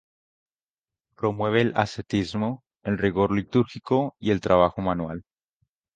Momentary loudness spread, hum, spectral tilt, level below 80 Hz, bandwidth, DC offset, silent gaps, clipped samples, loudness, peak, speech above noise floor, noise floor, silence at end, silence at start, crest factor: 9 LU; none; -7 dB/octave; -50 dBFS; 9 kHz; under 0.1%; none; under 0.1%; -25 LUFS; -4 dBFS; over 66 dB; under -90 dBFS; 0.75 s; 1.2 s; 22 dB